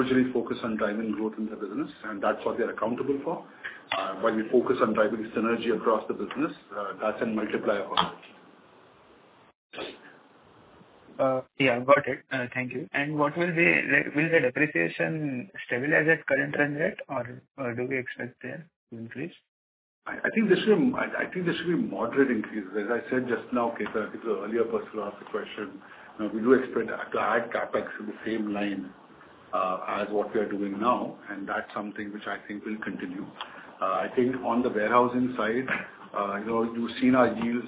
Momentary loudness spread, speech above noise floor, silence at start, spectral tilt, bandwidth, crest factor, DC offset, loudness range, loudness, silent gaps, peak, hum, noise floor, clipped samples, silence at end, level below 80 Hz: 14 LU; 29 dB; 0 s; -9.5 dB/octave; 4 kHz; 22 dB; under 0.1%; 7 LU; -28 LUFS; 9.55-9.70 s, 17.51-17.55 s, 18.76-18.87 s, 19.48-20.02 s; -6 dBFS; none; -57 dBFS; under 0.1%; 0 s; -66 dBFS